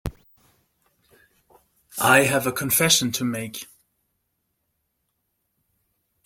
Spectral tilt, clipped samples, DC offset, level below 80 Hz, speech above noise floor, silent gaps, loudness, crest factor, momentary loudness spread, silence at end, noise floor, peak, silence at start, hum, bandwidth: -2.5 dB/octave; under 0.1%; under 0.1%; -52 dBFS; 54 dB; none; -20 LUFS; 24 dB; 20 LU; 2.6 s; -75 dBFS; -2 dBFS; 0.05 s; none; 16.5 kHz